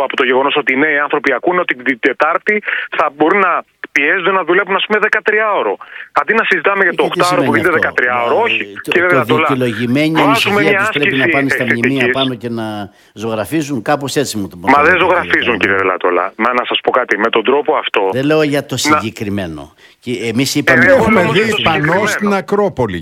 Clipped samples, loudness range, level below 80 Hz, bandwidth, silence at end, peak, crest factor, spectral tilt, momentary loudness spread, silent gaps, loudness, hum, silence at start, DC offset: 0.1%; 3 LU; -48 dBFS; 17 kHz; 0 s; 0 dBFS; 14 dB; -4.5 dB/octave; 8 LU; none; -13 LUFS; none; 0 s; under 0.1%